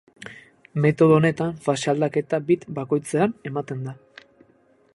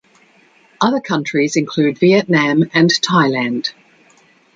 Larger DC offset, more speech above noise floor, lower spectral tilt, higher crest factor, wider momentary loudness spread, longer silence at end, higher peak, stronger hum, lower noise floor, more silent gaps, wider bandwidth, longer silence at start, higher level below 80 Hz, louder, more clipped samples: neither; about the same, 38 dB vs 37 dB; first, -7 dB/octave vs -5 dB/octave; about the same, 20 dB vs 16 dB; first, 17 LU vs 6 LU; first, 1 s vs 0.85 s; about the same, -4 dBFS vs -2 dBFS; neither; first, -59 dBFS vs -52 dBFS; neither; first, 11.5 kHz vs 9.2 kHz; second, 0.2 s vs 0.8 s; about the same, -62 dBFS vs -60 dBFS; second, -22 LUFS vs -15 LUFS; neither